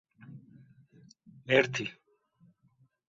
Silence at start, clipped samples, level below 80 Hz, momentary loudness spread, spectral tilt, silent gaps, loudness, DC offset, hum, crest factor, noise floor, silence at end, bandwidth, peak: 0.3 s; under 0.1%; -74 dBFS; 26 LU; -3 dB/octave; none; -29 LUFS; under 0.1%; none; 26 dB; -69 dBFS; 1.15 s; 7.6 kHz; -8 dBFS